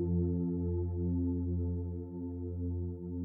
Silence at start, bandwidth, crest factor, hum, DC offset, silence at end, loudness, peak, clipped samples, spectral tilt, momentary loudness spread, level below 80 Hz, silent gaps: 0 s; 1.4 kHz; 12 dB; none; under 0.1%; 0 s; -36 LUFS; -22 dBFS; under 0.1%; -15.5 dB/octave; 8 LU; -48 dBFS; none